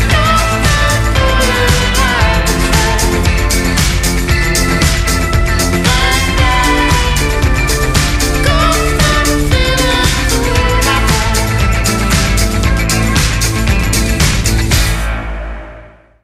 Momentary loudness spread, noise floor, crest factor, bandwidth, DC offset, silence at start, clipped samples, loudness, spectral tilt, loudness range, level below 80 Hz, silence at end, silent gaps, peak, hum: 3 LU; -36 dBFS; 12 dB; 16 kHz; under 0.1%; 0 s; under 0.1%; -12 LUFS; -4 dB/octave; 1 LU; -16 dBFS; 0.35 s; none; 0 dBFS; none